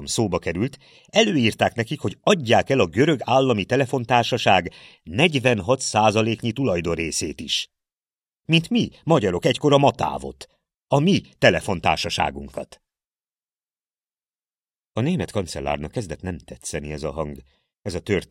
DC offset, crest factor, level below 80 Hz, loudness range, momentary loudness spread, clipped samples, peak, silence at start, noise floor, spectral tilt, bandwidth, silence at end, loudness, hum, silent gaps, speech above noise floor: under 0.1%; 20 dB; -48 dBFS; 9 LU; 14 LU; under 0.1%; -2 dBFS; 0 s; under -90 dBFS; -5 dB/octave; 15.5 kHz; 0.05 s; -21 LUFS; none; none; over 69 dB